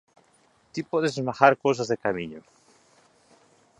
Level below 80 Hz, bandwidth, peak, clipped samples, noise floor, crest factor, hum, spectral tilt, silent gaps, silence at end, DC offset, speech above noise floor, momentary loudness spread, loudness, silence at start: -66 dBFS; 11 kHz; -2 dBFS; under 0.1%; -63 dBFS; 26 dB; none; -5.5 dB/octave; none; 1.4 s; under 0.1%; 39 dB; 18 LU; -24 LUFS; 0.75 s